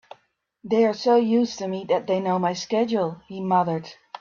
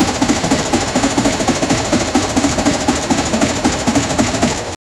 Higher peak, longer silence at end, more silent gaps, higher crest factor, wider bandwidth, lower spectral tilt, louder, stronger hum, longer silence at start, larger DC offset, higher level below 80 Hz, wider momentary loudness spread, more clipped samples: second, -8 dBFS vs -2 dBFS; second, 0.05 s vs 0.25 s; neither; about the same, 16 dB vs 14 dB; second, 7.2 kHz vs 13 kHz; first, -6 dB/octave vs -4 dB/octave; second, -23 LUFS vs -15 LUFS; neither; first, 0.65 s vs 0 s; neither; second, -68 dBFS vs -32 dBFS; first, 11 LU vs 1 LU; neither